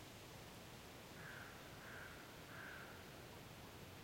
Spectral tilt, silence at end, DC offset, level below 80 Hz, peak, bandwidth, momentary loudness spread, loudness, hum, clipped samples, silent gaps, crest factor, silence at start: -4 dB/octave; 0 s; under 0.1%; -72 dBFS; -42 dBFS; 16.5 kHz; 3 LU; -55 LUFS; none; under 0.1%; none; 14 dB; 0 s